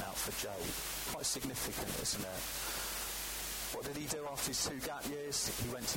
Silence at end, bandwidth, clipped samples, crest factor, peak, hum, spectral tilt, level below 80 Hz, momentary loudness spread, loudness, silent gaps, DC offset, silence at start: 0 s; 17 kHz; under 0.1%; 16 dB; -24 dBFS; none; -2 dB/octave; -54 dBFS; 4 LU; -38 LUFS; none; under 0.1%; 0 s